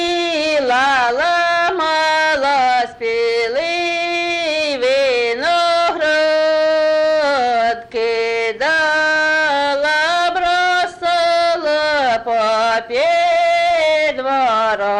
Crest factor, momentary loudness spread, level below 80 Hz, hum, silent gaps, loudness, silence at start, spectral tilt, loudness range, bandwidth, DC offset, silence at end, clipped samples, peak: 8 dB; 4 LU; -52 dBFS; none; none; -15 LUFS; 0 s; -2 dB/octave; 1 LU; 11 kHz; under 0.1%; 0 s; under 0.1%; -8 dBFS